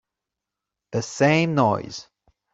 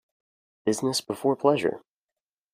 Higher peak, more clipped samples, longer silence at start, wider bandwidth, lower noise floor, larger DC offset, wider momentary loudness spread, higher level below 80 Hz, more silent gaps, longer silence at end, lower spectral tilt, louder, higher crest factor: about the same, -4 dBFS vs -6 dBFS; neither; first, 0.9 s vs 0.65 s; second, 8 kHz vs 15.5 kHz; second, -86 dBFS vs under -90 dBFS; neither; first, 16 LU vs 8 LU; first, -62 dBFS vs -70 dBFS; neither; second, 0.5 s vs 0.75 s; about the same, -5.5 dB/octave vs -4.5 dB/octave; first, -22 LUFS vs -26 LUFS; about the same, 20 dB vs 22 dB